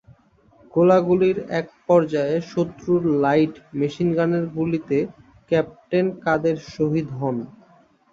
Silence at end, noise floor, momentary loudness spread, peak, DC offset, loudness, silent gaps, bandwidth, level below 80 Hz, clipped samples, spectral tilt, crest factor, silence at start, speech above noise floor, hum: 0.65 s; -56 dBFS; 9 LU; -4 dBFS; under 0.1%; -21 LUFS; none; 7.6 kHz; -58 dBFS; under 0.1%; -8 dB/octave; 18 dB; 0.75 s; 35 dB; none